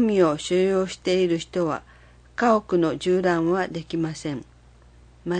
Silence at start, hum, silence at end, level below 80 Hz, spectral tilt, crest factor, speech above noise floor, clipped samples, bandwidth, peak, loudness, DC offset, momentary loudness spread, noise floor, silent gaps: 0 s; none; 0 s; -54 dBFS; -6 dB/octave; 18 dB; 29 dB; under 0.1%; 9.6 kHz; -6 dBFS; -23 LUFS; under 0.1%; 12 LU; -51 dBFS; none